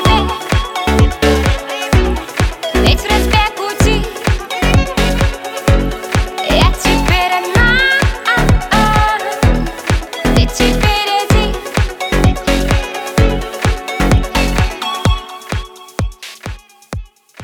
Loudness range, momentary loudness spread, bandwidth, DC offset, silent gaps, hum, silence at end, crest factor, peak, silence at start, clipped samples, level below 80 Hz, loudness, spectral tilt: 4 LU; 10 LU; 19 kHz; under 0.1%; none; none; 0 s; 14 dB; 0 dBFS; 0 s; under 0.1%; -18 dBFS; -14 LUFS; -5 dB/octave